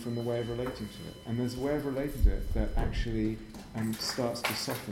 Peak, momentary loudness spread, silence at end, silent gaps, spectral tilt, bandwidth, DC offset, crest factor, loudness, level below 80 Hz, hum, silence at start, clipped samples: -12 dBFS; 8 LU; 0 s; none; -5.5 dB/octave; 16.5 kHz; under 0.1%; 20 dB; -33 LUFS; -36 dBFS; none; 0 s; under 0.1%